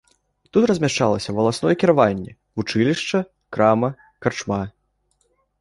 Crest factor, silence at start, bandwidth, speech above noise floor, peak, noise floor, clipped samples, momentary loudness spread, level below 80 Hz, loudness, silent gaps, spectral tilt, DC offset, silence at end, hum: 20 dB; 0.55 s; 11.5 kHz; 48 dB; -2 dBFS; -67 dBFS; under 0.1%; 11 LU; -52 dBFS; -20 LUFS; none; -5.5 dB/octave; under 0.1%; 0.9 s; none